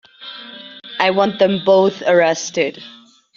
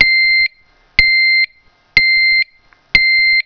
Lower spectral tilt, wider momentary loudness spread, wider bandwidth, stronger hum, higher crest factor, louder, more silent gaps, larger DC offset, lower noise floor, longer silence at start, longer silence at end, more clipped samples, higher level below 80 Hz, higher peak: first, -4 dB/octave vs -1.5 dB/octave; first, 20 LU vs 8 LU; first, 7.4 kHz vs 5.4 kHz; neither; about the same, 18 dB vs 14 dB; second, -16 LUFS vs -11 LUFS; neither; neither; second, -36 dBFS vs -51 dBFS; first, 0.2 s vs 0 s; first, 0.45 s vs 0.05 s; second, under 0.1% vs 0.5%; second, -64 dBFS vs -38 dBFS; about the same, 0 dBFS vs 0 dBFS